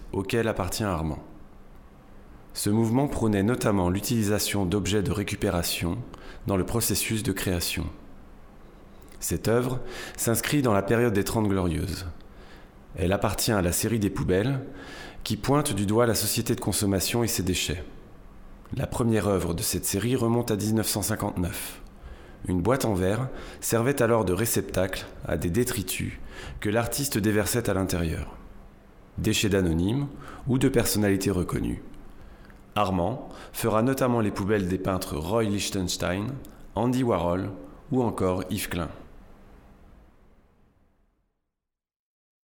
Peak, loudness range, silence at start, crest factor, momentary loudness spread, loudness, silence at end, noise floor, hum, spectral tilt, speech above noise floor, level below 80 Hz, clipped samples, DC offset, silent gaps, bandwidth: -10 dBFS; 3 LU; 0 s; 18 dB; 12 LU; -26 LUFS; 2.8 s; -87 dBFS; none; -5 dB/octave; 61 dB; -44 dBFS; under 0.1%; under 0.1%; none; over 20 kHz